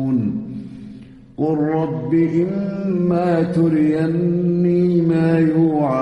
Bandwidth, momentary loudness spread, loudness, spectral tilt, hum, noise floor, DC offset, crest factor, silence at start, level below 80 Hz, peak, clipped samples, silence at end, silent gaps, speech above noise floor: 5.6 kHz; 14 LU; -18 LUFS; -10 dB/octave; none; -39 dBFS; under 0.1%; 12 dB; 0 s; -52 dBFS; -6 dBFS; under 0.1%; 0 s; none; 22 dB